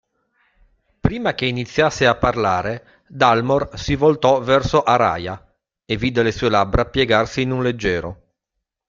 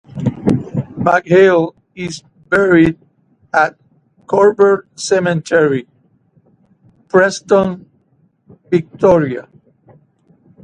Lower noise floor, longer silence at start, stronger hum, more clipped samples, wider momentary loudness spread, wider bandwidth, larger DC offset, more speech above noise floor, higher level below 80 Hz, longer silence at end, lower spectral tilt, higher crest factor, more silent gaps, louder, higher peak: first, -80 dBFS vs -57 dBFS; first, 1.05 s vs 0.15 s; neither; neither; second, 10 LU vs 15 LU; second, 7.6 kHz vs 10.5 kHz; neither; first, 61 dB vs 44 dB; first, -38 dBFS vs -48 dBFS; second, 0.75 s vs 1.2 s; about the same, -5.5 dB/octave vs -6 dB/octave; about the same, 18 dB vs 16 dB; neither; second, -18 LUFS vs -14 LUFS; about the same, 0 dBFS vs 0 dBFS